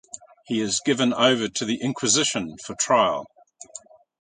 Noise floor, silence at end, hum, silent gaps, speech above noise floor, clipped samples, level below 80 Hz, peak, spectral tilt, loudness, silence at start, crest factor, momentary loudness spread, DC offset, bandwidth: -46 dBFS; 0.4 s; none; none; 23 dB; under 0.1%; -64 dBFS; -4 dBFS; -2.5 dB/octave; -22 LUFS; 0.15 s; 22 dB; 21 LU; under 0.1%; 9.6 kHz